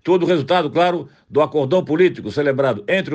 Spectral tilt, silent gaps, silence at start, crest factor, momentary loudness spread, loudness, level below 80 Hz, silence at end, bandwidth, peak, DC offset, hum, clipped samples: -7 dB/octave; none; 0.05 s; 14 dB; 4 LU; -18 LUFS; -60 dBFS; 0 s; 8.4 kHz; -4 dBFS; under 0.1%; none; under 0.1%